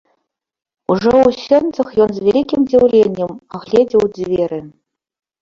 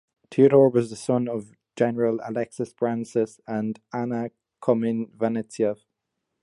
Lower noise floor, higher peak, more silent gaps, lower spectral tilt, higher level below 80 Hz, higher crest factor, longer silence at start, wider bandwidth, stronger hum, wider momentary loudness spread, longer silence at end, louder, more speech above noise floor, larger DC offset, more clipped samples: second, -71 dBFS vs -81 dBFS; about the same, -2 dBFS vs -4 dBFS; neither; about the same, -7 dB/octave vs -7.5 dB/octave; first, -48 dBFS vs -70 dBFS; second, 14 dB vs 20 dB; first, 0.9 s vs 0.3 s; second, 7.4 kHz vs 11.5 kHz; neither; about the same, 12 LU vs 12 LU; about the same, 0.75 s vs 0.7 s; first, -14 LUFS vs -24 LUFS; about the same, 57 dB vs 57 dB; neither; neither